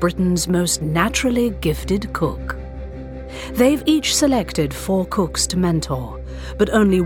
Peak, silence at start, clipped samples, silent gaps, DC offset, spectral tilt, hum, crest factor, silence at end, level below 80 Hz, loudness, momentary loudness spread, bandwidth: -2 dBFS; 0 s; under 0.1%; none; under 0.1%; -4.5 dB/octave; none; 18 dB; 0 s; -32 dBFS; -19 LUFS; 15 LU; 18.5 kHz